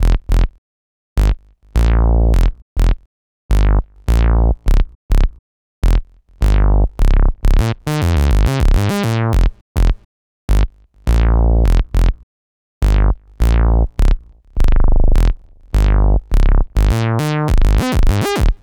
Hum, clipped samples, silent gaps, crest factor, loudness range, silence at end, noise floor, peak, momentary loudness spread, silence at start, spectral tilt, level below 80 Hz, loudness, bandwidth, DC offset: none; under 0.1%; 0.58-1.16 s, 2.62-2.76 s, 3.06-3.49 s, 4.95-5.09 s, 5.39-5.82 s, 9.61-9.75 s, 10.05-10.48 s, 12.23-12.81 s; 12 dB; 2 LU; 0.05 s; under -90 dBFS; 0 dBFS; 7 LU; 0 s; -7 dB/octave; -14 dBFS; -17 LUFS; 14 kHz; under 0.1%